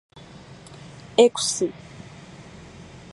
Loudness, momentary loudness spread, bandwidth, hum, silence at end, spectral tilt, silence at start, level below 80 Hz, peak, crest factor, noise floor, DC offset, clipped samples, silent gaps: -21 LUFS; 26 LU; 11.5 kHz; none; 0.15 s; -3 dB/octave; 0.5 s; -58 dBFS; -2 dBFS; 24 dB; -45 dBFS; under 0.1%; under 0.1%; none